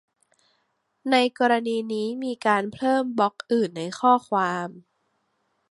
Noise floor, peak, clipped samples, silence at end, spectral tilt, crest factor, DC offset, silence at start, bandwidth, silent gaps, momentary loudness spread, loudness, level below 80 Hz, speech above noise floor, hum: -72 dBFS; -6 dBFS; under 0.1%; 0.9 s; -5 dB/octave; 20 dB; under 0.1%; 1.05 s; 11.5 kHz; none; 8 LU; -23 LUFS; -74 dBFS; 49 dB; none